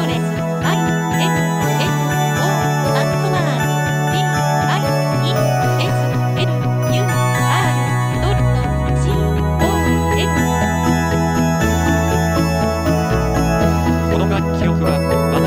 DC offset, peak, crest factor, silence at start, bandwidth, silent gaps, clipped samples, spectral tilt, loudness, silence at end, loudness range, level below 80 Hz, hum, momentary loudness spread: under 0.1%; -2 dBFS; 14 dB; 0 s; 16 kHz; none; under 0.1%; -6 dB/octave; -16 LUFS; 0 s; 1 LU; -28 dBFS; none; 2 LU